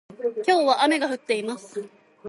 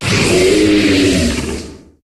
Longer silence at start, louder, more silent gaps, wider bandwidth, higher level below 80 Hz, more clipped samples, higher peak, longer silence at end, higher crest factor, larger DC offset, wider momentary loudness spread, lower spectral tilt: about the same, 0.1 s vs 0 s; second, -23 LUFS vs -12 LUFS; neither; second, 11.5 kHz vs 14 kHz; second, -80 dBFS vs -30 dBFS; neither; second, -8 dBFS vs 0 dBFS; second, 0 s vs 0.35 s; first, 18 dB vs 12 dB; neither; first, 15 LU vs 11 LU; second, -3 dB/octave vs -4.5 dB/octave